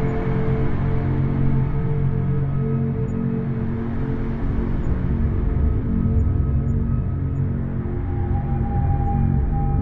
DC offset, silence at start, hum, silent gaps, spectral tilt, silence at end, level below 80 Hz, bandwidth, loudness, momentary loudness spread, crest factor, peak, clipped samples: under 0.1%; 0 s; none; none; -11.5 dB/octave; 0 s; -26 dBFS; 3.9 kHz; -23 LUFS; 4 LU; 12 dB; -8 dBFS; under 0.1%